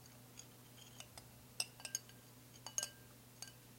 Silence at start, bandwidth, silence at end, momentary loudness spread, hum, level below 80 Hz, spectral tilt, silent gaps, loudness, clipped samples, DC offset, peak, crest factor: 0 s; 16.5 kHz; 0 s; 17 LU; none; -76 dBFS; -1 dB/octave; none; -48 LUFS; under 0.1%; under 0.1%; -20 dBFS; 32 dB